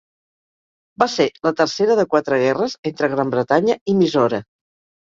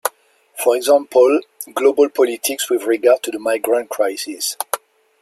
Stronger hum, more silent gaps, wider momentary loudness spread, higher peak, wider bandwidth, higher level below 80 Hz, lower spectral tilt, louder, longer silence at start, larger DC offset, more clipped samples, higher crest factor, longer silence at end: neither; first, 2.78-2.83 s, 3.81-3.86 s vs none; second, 5 LU vs 11 LU; about the same, 0 dBFS vs 0 dBFS; second, 7.6 kHz vs 16 kHz; first, -60 dBFS vs -70 dBFS; first, -5.5 dB/octave vs -1 dB/octave; about the same, -18 LUFS vs -17 LUFS; first, 1 s vs 0.05 s; neither; neither; about the same, 18 dB vs 18 dB; first, 0.6 s vs 0.45 s